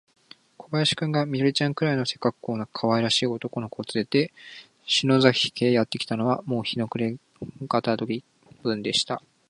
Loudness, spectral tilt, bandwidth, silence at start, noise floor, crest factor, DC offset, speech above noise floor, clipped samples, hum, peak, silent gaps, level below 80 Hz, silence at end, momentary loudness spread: -25 LUFS; -5 dB/octave; 11.5 kHz; 0.6 s; -49 dBFS; 24 dB; under 0.1%; 24 dB; under 0.1%; none; -2 dBFS; none; -64 dBFS; 0.3 s; 12 LU